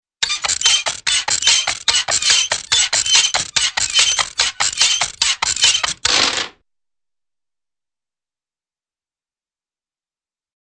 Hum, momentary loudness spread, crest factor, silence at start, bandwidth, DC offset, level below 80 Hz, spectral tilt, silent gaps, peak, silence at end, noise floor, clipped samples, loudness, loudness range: none; 5 LU; 18 dB; 0.2 s; 10 kHz; under 0.1%; -50 dBFS; 2 dB/octave; none; 0 dBFS; 4.15 s; under -90 dBFS; under 0.1%; -14 LUFS; 7 LU